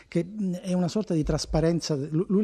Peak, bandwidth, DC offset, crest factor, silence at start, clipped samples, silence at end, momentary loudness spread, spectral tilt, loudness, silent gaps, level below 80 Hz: -10 dBFS; 10.5 kHz; under 0.1%; 16 dB; 0.1 s; under 0.1%; 0 s; 6 LU; -6.5 dB/octave; -27 LUFS; none; -42 dBFS